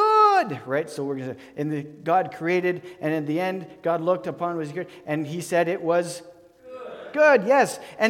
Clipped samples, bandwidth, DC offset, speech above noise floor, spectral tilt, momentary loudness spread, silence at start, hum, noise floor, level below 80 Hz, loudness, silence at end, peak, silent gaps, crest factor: under 0.1%; 16.5 kHz; under 0.1%; 19 dB; -5.5 dB/octave; 15 LU; 0 s; none; -43 dBFS; -72 dBFS; -24 LUFS; 0 s; -6 dBFS; none; 18 dB